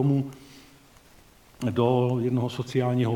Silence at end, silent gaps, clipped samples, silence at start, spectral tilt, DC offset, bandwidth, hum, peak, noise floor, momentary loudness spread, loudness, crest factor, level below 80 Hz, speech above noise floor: 0 s; none; under 0.1%; 0 s; -8 dB/octave; under 0.1%; 13.5 kHz; none; -10 dBFS; -54 dBFS; 11 LU; -26 LUFS; 16 dB; -60 dBFS; 30 dB